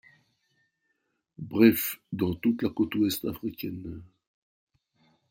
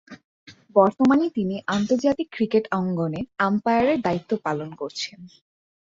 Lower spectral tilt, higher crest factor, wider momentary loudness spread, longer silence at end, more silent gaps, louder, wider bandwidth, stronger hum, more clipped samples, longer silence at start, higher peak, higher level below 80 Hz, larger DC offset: about the same, -5.5 dB/octave vs -6.5 dB/octave; about the same, 22 dB vs 20 dB; first, 19 LU vs 11 LU; first, 1.25 s vs 0.6 s; second, none vs 0.25-0.46 s; second, -27 LUFS vs -23 LUFS; first, 16.5 kHz vs 7.8 kHz; neither; neither; first, 1.4 s vs 0.1 s; second, -8 dBFS vs -2 dBFS; about the same, -62 dBFS vs -60 dBFS; neither